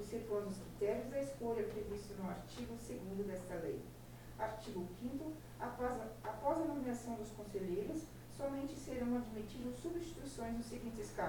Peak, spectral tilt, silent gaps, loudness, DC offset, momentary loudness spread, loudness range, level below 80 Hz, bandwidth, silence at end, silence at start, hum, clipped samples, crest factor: -24 dBFS; -6 dB/octave; none; -44 LUFS; under 0.1%; 7 LU; 3 LU; -58 dBFS; 19 kHz; 0 s; 0 s; none; under 0.1%; 18 dB